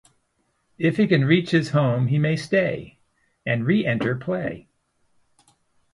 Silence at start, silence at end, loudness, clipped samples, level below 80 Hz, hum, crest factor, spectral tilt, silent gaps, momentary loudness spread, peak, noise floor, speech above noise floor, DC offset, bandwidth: 0.8 s; 1.35 s; -22 LUFS; under 0.1%; -60 dBFS; none; 20 dB; -7.5 dB/octave; none; 10 LU; -4 dBFS; -70 dBFS; 49 dB; under 0.1%; 11.5 kHz